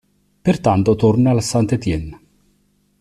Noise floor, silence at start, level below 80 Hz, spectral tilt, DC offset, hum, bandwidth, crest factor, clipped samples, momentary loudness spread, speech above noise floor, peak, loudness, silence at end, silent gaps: -61 dBFS; 0.45 s; -40 dBFS; -7 dB/octave; under 0.1%; none; 13 kHz; 14 dB; under 0.1%; 9 LU; 45 dB; -4 dBFS; -17 LUFS; 0.85 s; none